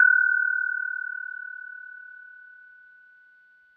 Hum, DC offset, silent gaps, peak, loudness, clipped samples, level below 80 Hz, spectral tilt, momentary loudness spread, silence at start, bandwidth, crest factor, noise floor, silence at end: none; under 0.1%; none; -8 dBFS; -24 LUFS; under 0.1%; under -90 dBFS; 5.5 dB/octave; 25 LU; 0 s; 1.9 kHz; 20 dB; -57 dBFS; 1.35 s